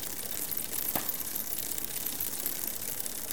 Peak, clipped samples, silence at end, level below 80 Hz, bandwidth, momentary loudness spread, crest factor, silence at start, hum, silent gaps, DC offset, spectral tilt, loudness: -12 dBFS; under 0.1%; 0 s; -62 dBFS; 19 kHz; 3 LU; 24 dB; 0 s; none; none; 0.7%; -1 dB/octave; -32 LUFS